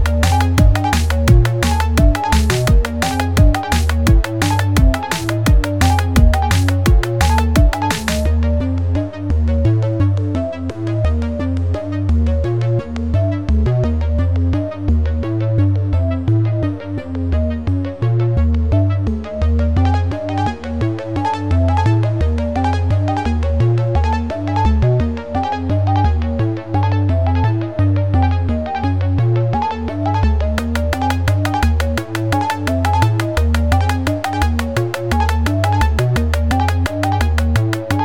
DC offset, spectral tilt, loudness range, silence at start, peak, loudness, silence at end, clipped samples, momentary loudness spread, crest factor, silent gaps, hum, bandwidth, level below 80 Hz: 1%; -6.5 dB/octave; 3 LU; 0 s; 0 dBFS; -17 LUFS; 0 s; under 0.1%; 6 LU; 14 dB; none; none; 17 kHz; -22 dBFS